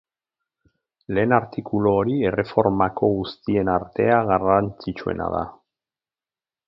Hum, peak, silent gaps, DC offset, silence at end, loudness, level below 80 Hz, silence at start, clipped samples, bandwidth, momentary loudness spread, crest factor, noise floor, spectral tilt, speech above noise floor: none; -2 dBFS; none; under 0.1%; 1.15 s; -22 LUFS; -48 dBFS; 1.1 s; under 0.1%; 5.8 kHz; 9 LU; 22 dB; under -90 dBFS; -10 dB/octave; over 69 dB